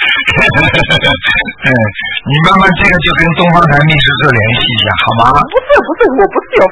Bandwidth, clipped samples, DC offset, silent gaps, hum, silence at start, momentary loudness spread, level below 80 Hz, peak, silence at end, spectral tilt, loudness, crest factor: 11 kHz; 1%; under 0.1%; none; none; 0 s; 4 LU; -28 dBFS; 0 dBFS; 0 s; -6 dB/octave; -8 LUFS; 8 dB